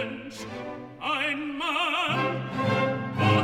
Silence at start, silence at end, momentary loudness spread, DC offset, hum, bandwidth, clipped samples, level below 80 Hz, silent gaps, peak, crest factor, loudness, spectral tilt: 0 s; 0 s; 13 LU; under 0.1%; none; 14.5 kHz; under 0.1%; -62 dBFS; none; -10 dBFS; 18 dB; -27 LUFS; -5.5 dB/octave